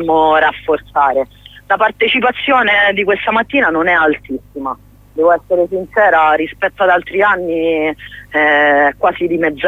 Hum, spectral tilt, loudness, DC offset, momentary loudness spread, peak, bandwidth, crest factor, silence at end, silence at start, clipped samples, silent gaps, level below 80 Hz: 50 Hz at -45 dBFS; -6 dB/octave; -13 LUFS; under 0.1%; 11 LU; 0 dBFS; 15 kHz; 12 dB; 0 s; 0 s; under 0.1%; none; -46 dBFS